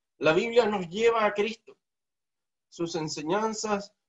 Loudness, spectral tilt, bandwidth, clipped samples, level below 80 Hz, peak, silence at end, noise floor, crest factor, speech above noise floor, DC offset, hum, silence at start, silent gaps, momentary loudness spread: -27 LUFS; -4 dB/octave; 8.2 kHz; under 0.1%; -66 dBFS; -8 dBFS; 0.2 s; under -90 dBFS; 20 dB; over 63 dB; under 0.1%; none; 0.2 s; none; 9 LU